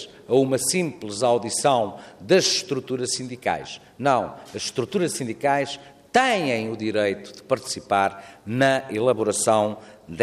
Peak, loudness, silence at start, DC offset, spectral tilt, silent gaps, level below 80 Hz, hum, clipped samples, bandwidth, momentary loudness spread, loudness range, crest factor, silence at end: -6 dBFS; -23 LUFS; 0 s; under 0.1%; -3.5 dB/octave; none; -66 dBFS; none; under 0.1%; 15 kHz; 11 LU; 3 LU; 18 dB; 0 s